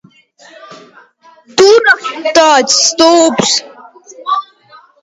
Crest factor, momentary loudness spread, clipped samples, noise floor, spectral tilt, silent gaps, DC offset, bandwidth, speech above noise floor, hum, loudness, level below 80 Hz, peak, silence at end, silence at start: 12 dB; 11 LU; 0.2%; -44 dBFS; -1.5 dB/octave; none; under 0.1%; 11.5 kHz; 35 dB; none; -9 LUFS; -56 dBFS; 0 dBFS; 0.6 s; 0.7 s